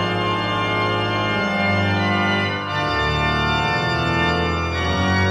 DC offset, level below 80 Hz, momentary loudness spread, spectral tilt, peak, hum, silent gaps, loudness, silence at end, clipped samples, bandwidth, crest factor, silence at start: under 0.1%; -36 dBFS; 3 LU; -5.5 dB/octave; -6 dBFS; none; none; -20 LUFS; 0 s; under 0.1%; 11.5 kHz; 12 dB; 0 s